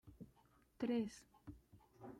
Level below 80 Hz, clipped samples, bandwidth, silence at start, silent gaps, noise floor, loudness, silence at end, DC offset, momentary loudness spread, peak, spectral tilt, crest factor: -72 dBFS; under 0.1%; 13.5 kHz; 0.05 s; none; -73 dBFS; -43 LUFS; 0 s; under 0.1%; 21 LU; -30 dBFS; -6 dB/octave; 18 dB